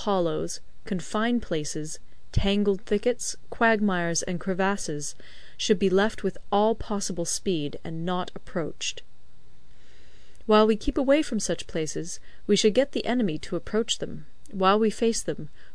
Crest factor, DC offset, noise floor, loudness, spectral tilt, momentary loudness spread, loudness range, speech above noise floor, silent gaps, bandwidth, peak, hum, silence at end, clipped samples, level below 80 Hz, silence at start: 18 dB; 2%; -54 dBFS; -26 LUFS; -4.5 dB/octave; 12 LU; 4 LU; 28 dB; none; 11 kHz; -8 dBFS; none; 0.1 s; under 0.1%; -44 dBFS; 0 s